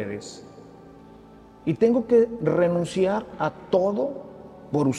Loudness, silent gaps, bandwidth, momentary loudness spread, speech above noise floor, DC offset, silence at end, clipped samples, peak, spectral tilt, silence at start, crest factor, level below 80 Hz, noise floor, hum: -23 LUFS; none; 11 kHz; 20 LU; 25 dB; under 0.1%; 0 s; under 0.1%; -8 dBFS; -7 dB/octave; 0 s; 18 dB; -58 dBFS; -48 dBFS; none